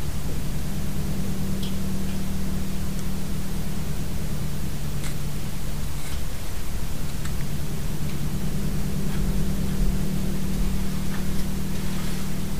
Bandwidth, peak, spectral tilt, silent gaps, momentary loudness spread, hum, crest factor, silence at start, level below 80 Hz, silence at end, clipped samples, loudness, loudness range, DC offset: 16 kHz; -10 dBFS; -5.5 dB/octave; none; 5 LU; none; 14 dB; 0 s; -32 dBFS; 0 s; under 0.1%; -30 LUFS; 4 LU; 7%